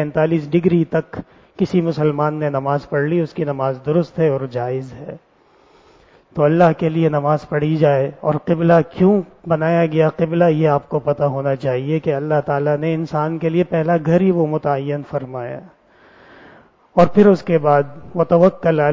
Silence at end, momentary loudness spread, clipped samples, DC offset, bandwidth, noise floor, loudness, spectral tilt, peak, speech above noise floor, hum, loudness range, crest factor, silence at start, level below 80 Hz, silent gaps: 0 s; 10 LU; under 0.1%; under 0.1%; 7.2 kHz; -52 dBFS; -17 LUFS; -9.5 dB/octave; 0 dBFS; 36 dB; none; 4 LU; 16 dB; 0 s; -52 dBFS; none